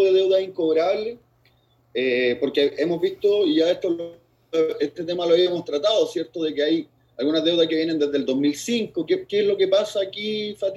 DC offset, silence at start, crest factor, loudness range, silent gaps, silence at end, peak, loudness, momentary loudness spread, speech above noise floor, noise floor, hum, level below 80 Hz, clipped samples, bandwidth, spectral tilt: under 0.1%; 0 s; 14 dB; 1 LU; none; 0 s; -6 dBFS; -22 LUFS; 8 LU; 39 dB; -61 dBFS; none; -68 dBFS; under 0.1%; 12.5 kHz; -4.5 dB/octave